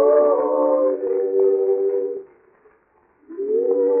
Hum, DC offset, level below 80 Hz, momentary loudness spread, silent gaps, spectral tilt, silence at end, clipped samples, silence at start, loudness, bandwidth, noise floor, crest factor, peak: none; under 0.1%; -74 dBFS; 12 LU; none; -8.5 dB/octave; 0 s; under 0.1%; 0 s; -19 LUFS; 2.5 kHz; -59 dBFS; 14 dB; -6 dBFS